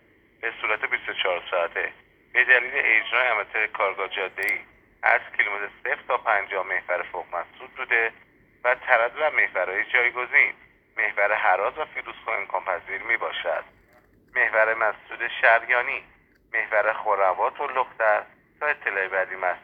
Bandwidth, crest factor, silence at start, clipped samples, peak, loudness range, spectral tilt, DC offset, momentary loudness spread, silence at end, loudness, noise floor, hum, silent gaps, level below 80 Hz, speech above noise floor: 18 kHz; 22 dB; 0.45 s; under 0.1%; -2 dBFS; 4 LU; -3 dB/octave; under 0.1%; 10 LU; 0.05 s; -23 LUFS; -58 dBFS; none; none; -66 dBFS; 34 dB